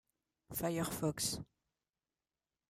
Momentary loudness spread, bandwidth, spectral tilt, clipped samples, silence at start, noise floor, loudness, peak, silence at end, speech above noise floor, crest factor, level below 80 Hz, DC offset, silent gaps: 9 LU; 15.5 kHz; -4 dB/octave; under 0.1%; 0.5 s; under -90 dBFS; -39 LUFS; -24 dBFS; 1.25 s; over 51 dB; 18 dB; -66 dBFS; under 0.1%; none